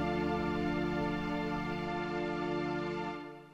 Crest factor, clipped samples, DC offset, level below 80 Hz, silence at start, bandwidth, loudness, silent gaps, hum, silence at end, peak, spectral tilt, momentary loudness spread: 12 dB; under 0.1%; under 0.1%; -52 dBFS; 0 s; 9 kHz; -35 LUFS; none; none; 0 s; -22 dBFS; -7 dB/octave; 4 LU